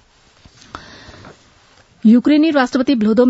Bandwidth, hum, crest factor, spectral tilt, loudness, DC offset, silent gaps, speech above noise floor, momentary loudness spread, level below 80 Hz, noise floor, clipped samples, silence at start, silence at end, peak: 8 kHz; none; 14 dB; -6.5 dB/octave; -13 LUFS; under 0.1%; none; 38 dB; 25 LU; -54 dBFS; -50 dBFS; under 0.1%; 0.75 s; 0 s; -2 dBFS